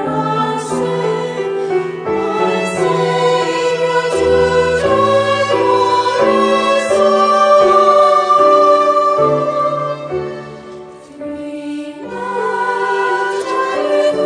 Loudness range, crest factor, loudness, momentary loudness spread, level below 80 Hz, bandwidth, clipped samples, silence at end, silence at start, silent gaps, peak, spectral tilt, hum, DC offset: 9 LU; 14 dB; -13 LUFS; 15 LU; -46 dBFS; 10 kHz; under 0.1%; 0 s; 0 s; none; 0 dBFS; -5 dB/octave; none; under 0.1%